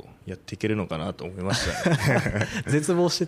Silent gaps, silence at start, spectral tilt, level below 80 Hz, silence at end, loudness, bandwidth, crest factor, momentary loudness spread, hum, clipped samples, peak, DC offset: none; 0.05 s; -5 dB/octave; -46 dBFS; 0 s; -25 LUFS; 15.5 kHz; 16 dB; 12 LU; none; under 0.1%; -8 dBFS; under 0.1%